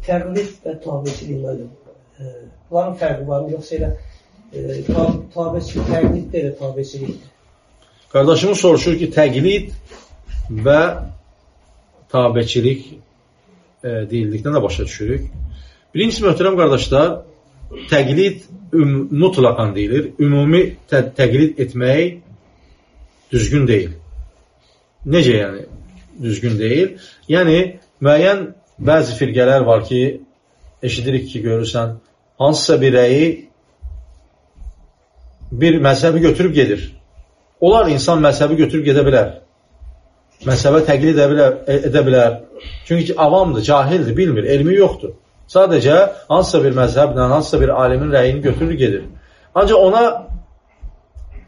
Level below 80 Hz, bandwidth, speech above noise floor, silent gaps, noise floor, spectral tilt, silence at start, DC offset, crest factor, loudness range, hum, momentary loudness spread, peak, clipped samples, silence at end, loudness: -34 dBFS; 10.5 kHz; 41 dB; none; -56 dBFS; -6.5 dB/octave; 0 s; under 0.1%; 14 dB; 7 LU; none; 16 LU; 0 dBFS; under 0.1%; 0.1 s; -15 LUFS